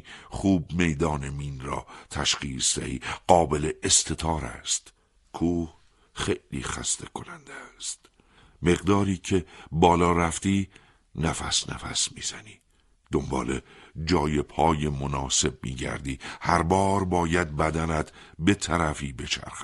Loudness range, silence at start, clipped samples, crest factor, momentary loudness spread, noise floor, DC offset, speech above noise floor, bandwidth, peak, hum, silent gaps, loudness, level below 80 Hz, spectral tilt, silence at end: 5 LU; 0.05 s; under 0.1%; 24 dB; 13 LU; -63 dBFS; under 0.1%; 37 dB; 12 kHz; -2 dBFS; none; none; -26 LUFS; -42 dBFS; -4 dB/octave; 0 s